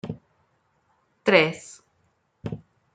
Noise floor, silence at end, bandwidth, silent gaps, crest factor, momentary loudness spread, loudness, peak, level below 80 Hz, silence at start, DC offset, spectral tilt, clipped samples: -69 dBFS; 0.4 s; 9.4 kHz; none; 26 dB; 23 LU; -22 LUFS; -2 dBFS; -64 dBFS; 0.05 s; under 0.1%; -5 dB/octave; under 0.1%